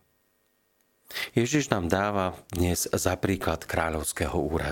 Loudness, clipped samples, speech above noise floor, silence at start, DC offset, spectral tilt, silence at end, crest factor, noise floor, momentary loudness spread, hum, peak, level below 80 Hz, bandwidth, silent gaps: -27 LUFS; under 0.1%; 43 dB; 1.1 s; under 0.1%; -4.5 dB/octave; 0 s; 26 dB; -70 dBFS; 4 LU; none; -2 dBFS; -44 dBFS; 17 kHz; none